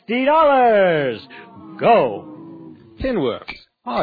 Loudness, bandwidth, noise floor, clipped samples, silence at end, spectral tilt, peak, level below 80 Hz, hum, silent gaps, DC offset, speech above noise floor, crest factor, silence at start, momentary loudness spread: -17 LUFS; 4.9 kHz; -40 dBFS; under 0.1%; 0 s; -8.5 dB/octave; -4 dBFS; -46 dBFS; none; none; under 0.1%; 23 dB; 14 dB; 0.1 s; 24 LU